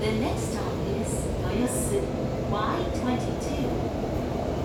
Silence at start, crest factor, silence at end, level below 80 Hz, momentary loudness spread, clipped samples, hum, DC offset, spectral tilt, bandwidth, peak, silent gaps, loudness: 0 s; 12 dB; 0 s; -38 dBFS; 3 LU; under 0.1%; none; under 0.1%; -6 dB/octave; 19 kHz; -14 dBFS; none; -28 LUFS